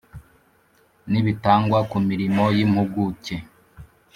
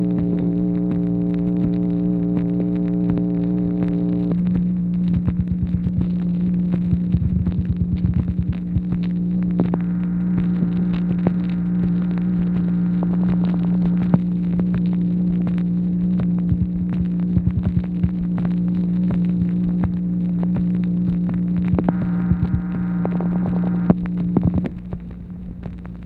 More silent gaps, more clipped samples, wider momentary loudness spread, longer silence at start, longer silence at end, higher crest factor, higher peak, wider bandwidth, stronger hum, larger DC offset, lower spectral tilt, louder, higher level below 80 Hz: neither; neither; first, 11 LU vs 3 LU; first, 0.15 s vs 0 s; first, 0.3 s vs 0 s; about the same, 20 dB vs 18 dB; about the same, -2 dBFS vs 0 dBFS; first, 11.5 kHz vs 4 kHz; neither; neither; second, -8 dB/octave vs -12 dB/octave; about the same, -21 LUFS vs -20 LUFS; second, -52 dBFS vs -34 dBFS